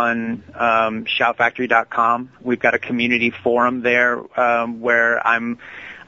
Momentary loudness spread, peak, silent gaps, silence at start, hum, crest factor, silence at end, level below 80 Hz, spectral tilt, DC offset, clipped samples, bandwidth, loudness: 8 LU; -2 dBFS; none; 0 s; none; 18 dB; 0.05 s; -60 dBFS; -5.5 dB/octave; under 0.1%; under 0.1%; 7.4 kHz; -18 LUFS